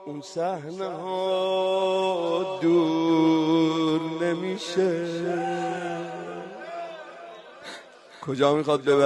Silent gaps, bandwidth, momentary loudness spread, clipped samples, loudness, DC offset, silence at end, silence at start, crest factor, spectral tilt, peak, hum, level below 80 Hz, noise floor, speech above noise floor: none; 11 kHz; 18 LU; under 0.1%; -25 LUFS; under 0.1%; 0 s; 0 s; 18 dB; -6 dB/octave; -8 dBFS; none; -70 dBFS; -45 dBFS; 22 dB